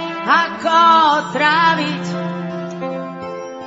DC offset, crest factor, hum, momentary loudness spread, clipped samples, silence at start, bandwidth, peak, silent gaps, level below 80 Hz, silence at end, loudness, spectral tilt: under 0.1%; 16 dB; none; 16 LU; under 0.1%; 0 s; 8 kHz; -2 dBFS; none; -66 dBFS; 0 s; -15 LUFS; -4.5 dB/octave